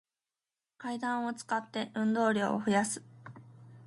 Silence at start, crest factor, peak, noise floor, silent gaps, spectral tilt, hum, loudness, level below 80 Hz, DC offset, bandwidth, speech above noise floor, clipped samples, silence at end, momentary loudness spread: 0.8 s; 20 dB; -14 dBFS; under -90 dBFS; none; -4.5 dB/octave; none; -32 LUFS; -78 dBFS; under 0.1%; 11.5 kHz; over 58 dB; under 0.1%; 0 s; 17 LU